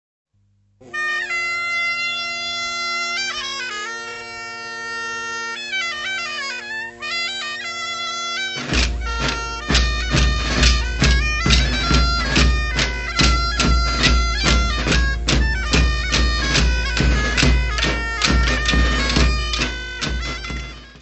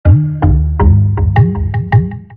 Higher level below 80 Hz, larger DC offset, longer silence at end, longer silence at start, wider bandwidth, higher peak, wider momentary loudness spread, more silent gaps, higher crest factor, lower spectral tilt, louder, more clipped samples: about the same, -22 dBFS vs -18 dBFS; neither; about the same, 0 s vs 0 s; first, 0.8 s vs 0.05 s; first, 8.4 kHz vs 3.6 kHz; about the same, -2 dBFS vs 0 dBFS; first, 9 LU vs 3 LU; neither; first, 18 dB vs 10 dB; second, -3.5 dB/octave vs -12 dB/octave; second, -19 LUFS vs -12 LUFS; neither